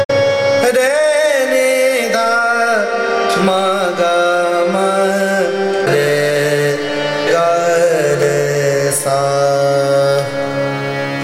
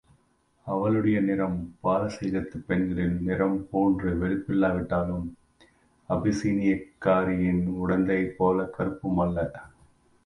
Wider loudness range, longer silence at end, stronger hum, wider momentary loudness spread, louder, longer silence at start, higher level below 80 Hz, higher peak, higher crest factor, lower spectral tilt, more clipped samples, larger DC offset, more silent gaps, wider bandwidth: about the same, 1 LU vs 2 LU; second, 0 s vs 0.55 s; neither; second, 4 LU vs 7 LU; first, -14 LUFS vs -27 LUFS; second, 0 s vs 0.65 s; second, -58 dBFS vs -46 dBFS; first, 0 dBFS vs -10 dBFS; about the same, 12 dB vs 16 dB; second, -4 dB/octave vs -8.5 dB/octave; neither; neither; first, 0.05-0.09 s vs none; first, 16 kHz vs 10.5 kHz